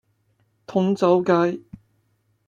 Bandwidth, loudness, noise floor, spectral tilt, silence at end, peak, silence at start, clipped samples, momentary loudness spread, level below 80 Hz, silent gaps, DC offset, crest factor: 7.6 kHz; -20 LUFS; -67 dBFS; -7.5 dB/octave; 0.85 s; -6 dBFS; 0.7 s; under 0.1%; 9 LU; -64 dBFS; none; under 0.1%; 18 dB